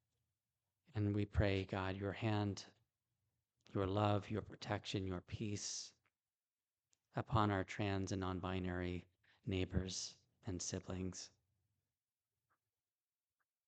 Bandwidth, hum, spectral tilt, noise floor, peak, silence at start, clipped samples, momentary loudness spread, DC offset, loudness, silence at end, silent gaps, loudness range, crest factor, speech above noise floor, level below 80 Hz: 9 kHz; none; -5.5 dB/octave; under -90 dBFS; -22 dBFS; 0.95 s; under 0.1%; 12 LU; under 0.1%; -42 LUFS; 2.4 s; 6.53-6.58 s; 5 LU; 22 dB; over 49 dB; -60 dBFS